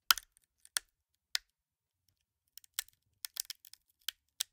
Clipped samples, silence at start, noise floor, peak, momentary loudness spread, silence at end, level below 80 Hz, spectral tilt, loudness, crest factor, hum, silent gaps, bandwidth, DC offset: under 0.1%; 0.1 s; under -90 dBFS; -4 dBFS; 16 LU; 1.7 s; -76 dBFS; 4 dB/octave; -39 LUFS; 38 dB; none; none; 18 kHz; under 0.1%